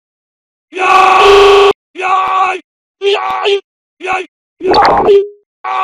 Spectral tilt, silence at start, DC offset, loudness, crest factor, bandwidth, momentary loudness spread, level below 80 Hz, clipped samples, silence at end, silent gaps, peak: -3 dB/octave; 0.75 s; under 0.1%; -9 LUFS; 10 dB; 12 kHz; 18 LU; -40 dBFS; under 0.1%; 0 s; 1.75-1.94 s, 2.64-2.94 s, 3.64-3.97 s, 4.28-4.57 s, 5.46-5.64 s; 0 dBFS